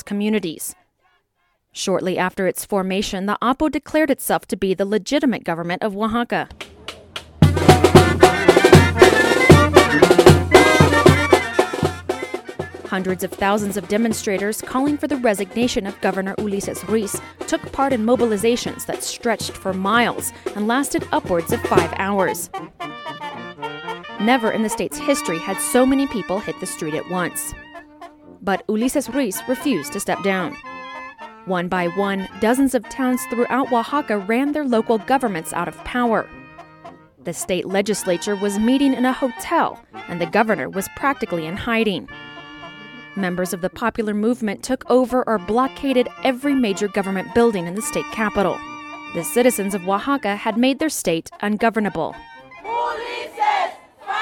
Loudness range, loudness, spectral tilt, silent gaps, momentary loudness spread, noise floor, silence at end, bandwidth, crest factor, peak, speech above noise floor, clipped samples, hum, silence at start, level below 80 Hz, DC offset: 10 LU; -19 LUFS; -5 dB/octave; none; 17 LU; -68 dBFS; 0 s; 18 kHz; 20 dB; 0 dBFS; 47 dB; under 0.1%; none; 0.05 s; -42 dBFS; under 0.1%